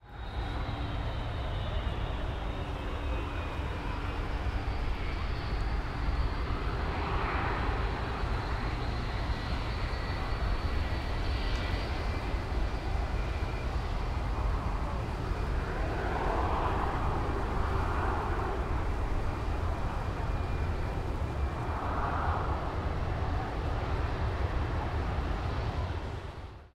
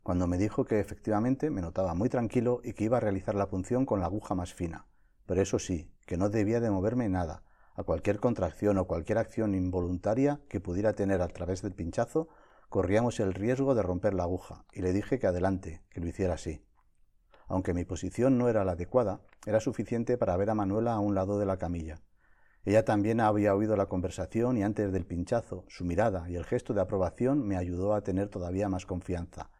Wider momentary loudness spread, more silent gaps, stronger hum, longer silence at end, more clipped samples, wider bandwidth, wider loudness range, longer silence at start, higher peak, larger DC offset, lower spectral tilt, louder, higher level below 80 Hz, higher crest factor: second, 4 LU vs 10 LU; neither; neither; about the same, 0.05 s vs 0.15 s; neither; second, 11 kHz vs 12.5 kHz; about the same, 3 LU vs 3 LU; about the same, 0.05 s vs 0.05 s; second, -16 dBFS vs -12 dBFS; neither; about the same, -7 dB/octave vs -7.5 dB/octave; second, -34 LUFS vs -31 LUFS; first, -34 dBFS vs -50 dBFS; about the same, 16 dB vs 18 dB